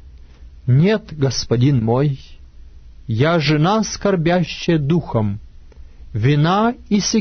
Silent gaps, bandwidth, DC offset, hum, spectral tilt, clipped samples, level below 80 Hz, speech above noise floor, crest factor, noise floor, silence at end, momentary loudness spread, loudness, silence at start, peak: none; 6.6 kHz; under 0.1%; none; -6 dB/octave; under 0.1%; -40 dBFS; 23 dB; 14 dB; -40 dBFS; 0 s; 10 LU; -17 LUFS; 0.05 s; -4 dBFS